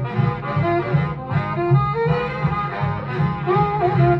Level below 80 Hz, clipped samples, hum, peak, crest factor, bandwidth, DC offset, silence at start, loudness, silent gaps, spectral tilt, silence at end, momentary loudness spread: -40 dBFS; under 0.1%; none; -6 dBFS; 14 dB; 5.6 kHz; under 0.1%; 0 s; -21 LUFS; none; -10 dB/octave; 0 s; 5 LU